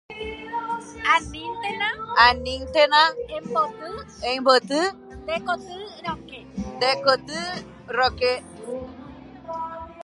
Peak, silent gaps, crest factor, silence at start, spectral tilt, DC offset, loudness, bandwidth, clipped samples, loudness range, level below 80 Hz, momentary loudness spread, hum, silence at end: -2 dBFS; none; 22 dB; 0.1 s; -3.5 dB/octave; under 0.1%; -22 LUFS; 11.5 kHz; under 0.1%; 5 LU; -48 dBFS; 18 LU; none; 0 s